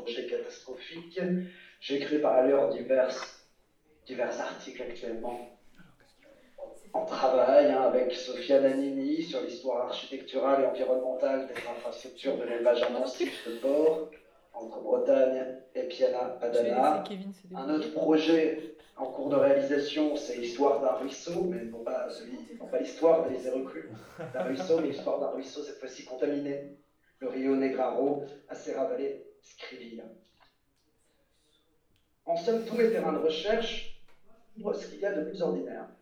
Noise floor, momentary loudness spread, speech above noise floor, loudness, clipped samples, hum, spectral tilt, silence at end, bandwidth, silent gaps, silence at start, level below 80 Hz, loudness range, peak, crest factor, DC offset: -72 dBFS; 18 LU; 43 dB; -30 LUFS; under 0.1%; none; -5.5 dB/octave; 0.1 s; 12.5 kHz; none; 0 s; -62 dBFS; 8 LU; -10 dBFS; 20 dB; under 0.1%